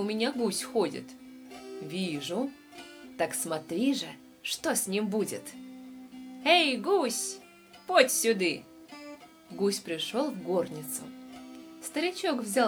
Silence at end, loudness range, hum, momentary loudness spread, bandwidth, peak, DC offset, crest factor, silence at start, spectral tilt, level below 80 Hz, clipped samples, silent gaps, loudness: 0 s; 7 LU; none; 23 LU; over 20 kHz; -8 dBFS; under 0.1%; 24 dB; 0 s; -3 dB/octave; -74 dBFS; under 0.1%; none; -29 LUFS